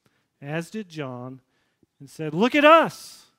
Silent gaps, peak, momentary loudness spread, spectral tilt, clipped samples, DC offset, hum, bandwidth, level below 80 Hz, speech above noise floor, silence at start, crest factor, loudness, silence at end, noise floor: none; -2 dBFS; 25 LU; -5 dB/octave; under 0.1%; under 0.1%; none; 16 kHz; -72 dBFS; 45 dB; 0.4 s; 22 dB; -19 LUFS; 0.3 s; -67 dBFS